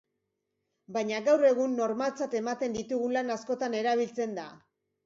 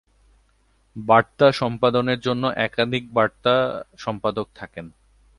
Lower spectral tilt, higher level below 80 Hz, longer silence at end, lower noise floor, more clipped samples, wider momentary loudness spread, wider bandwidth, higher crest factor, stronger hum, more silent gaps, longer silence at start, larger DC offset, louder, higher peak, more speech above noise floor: second, -4.5 dB/octave vs -6.5 dB/octave; second, -72 dBFS vs -56 dBFS; about the same, 0.5 s vs 0.5 s; first, -82 dBFS vs -62 dBFS; neither; second, 11 LU vs 16 LU; second, 7.8 kHz vs 11.5 kHz; about the same, 18 dB vs 22 dB; neither; neither; about the same, 0.9 s vs 0.95 s; neither; second, -29 LUFS vs -21 LUFS; second, -12 dBFS vs 0 dBFS; first, 53 dB vs 41 dB